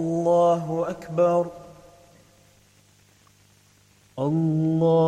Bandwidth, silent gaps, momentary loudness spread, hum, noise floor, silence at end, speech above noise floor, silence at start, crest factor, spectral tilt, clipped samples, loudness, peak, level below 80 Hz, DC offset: 9.6 kHz; none; 12 LU; 50 Hz at -60 dBFS; -58 dBFS; 0 s; 37 dB; 0 s; 14 dB; -8.5 dB/octave; under 0.1%; -23 LUFS; -10 dBFS; -62 dBFS; under 0.1%